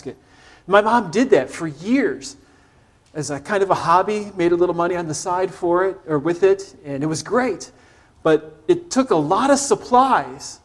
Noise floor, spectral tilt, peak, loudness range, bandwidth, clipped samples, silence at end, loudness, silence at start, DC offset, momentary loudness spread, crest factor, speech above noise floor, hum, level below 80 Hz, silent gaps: -54 dBFS; -5 dB/octave; 0 dBFS; 2 LU; 12 kHz; under 0.1%; 0.1 s; -19 LUFS; 0.05 s; under 0.1%; 12 LU; 18 dB; 35 dB; none; -56 dBFS; none